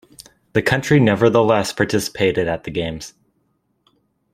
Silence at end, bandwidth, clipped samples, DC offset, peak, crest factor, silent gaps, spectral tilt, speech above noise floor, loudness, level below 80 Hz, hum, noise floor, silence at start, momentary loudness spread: 1.25 s; 16 kHz; under 0.1%; under 0.1%; 0 dBFS; 18 dB; none; -5.5 dB/octave; 49 dB; -18 LUFS; -48 dBFS; none; -66 dBFS; 0.55 s; 11 LU